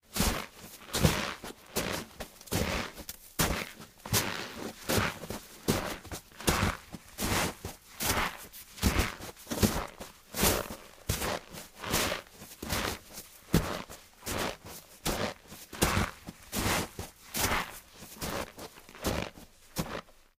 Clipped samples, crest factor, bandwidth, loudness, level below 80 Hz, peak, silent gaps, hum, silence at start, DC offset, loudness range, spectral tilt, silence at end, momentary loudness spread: under 0.1%; 26 dB; 16 kHz; -33 LUFS; -44 dBFS; -8 dBFS; none; none; 0.1 s; under 0.1%; 3 LU; -3.5 dB/octave; 0.25 s; 16 LU